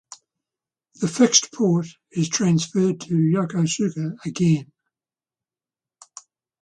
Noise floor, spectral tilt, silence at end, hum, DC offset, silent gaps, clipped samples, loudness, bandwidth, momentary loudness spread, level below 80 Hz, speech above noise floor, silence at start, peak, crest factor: under -90 dBFS; -4.5 dB/octave; 2 s; none; under 0.1%; none; under 0.1%; -21 LUFS; 10 kHz; 11 LU; -64 dBFS; over 69 dB; 1 s; -2 dBFS; 22 dB